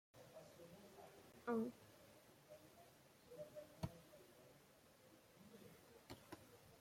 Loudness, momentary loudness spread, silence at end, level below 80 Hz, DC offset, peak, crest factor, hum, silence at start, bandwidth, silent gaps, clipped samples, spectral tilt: -55 LUFS; 20 LU; 0 s; -78 dBFS; under 0.1%; -32 dBFS; 24 dB; none; 0.15 s; 16.5 kHz; none; under 0.1%; -6 dB/octave